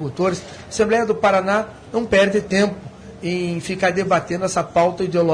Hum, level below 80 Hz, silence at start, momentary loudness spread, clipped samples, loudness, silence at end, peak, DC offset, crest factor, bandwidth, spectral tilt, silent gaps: none; -48 dBFS; 0 s; 10 LU; under 0.1%; -19 LUFS; 0 s; -4 dBFS; under 0.1%; 16 dB; 10.5 kHz; -5 dB/octave; none